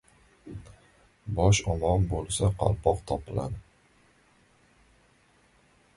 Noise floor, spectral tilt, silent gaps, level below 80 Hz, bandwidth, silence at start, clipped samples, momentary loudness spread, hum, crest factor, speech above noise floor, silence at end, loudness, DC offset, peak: -63 dBFS; -5.5 dB/octave; none; -42 dBFS; 11.5 kHz; 0.45 s; under 0.1%; 22 LU; none; 22 dB; 37 dB; 2.35 s; -27 LUFS; under 0.1%; -8 dBFS